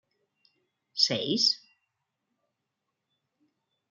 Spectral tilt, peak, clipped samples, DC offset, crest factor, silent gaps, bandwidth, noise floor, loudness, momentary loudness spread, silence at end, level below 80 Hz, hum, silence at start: -2.5 dB/octave; -8 dBFS; under 0.1%; under 0.1%; 26 dB; none; 12 kHz; -84 dBFS; -25 LUFS; 10 LU; 2.35 s; -82 dBFS; none; 0.95 s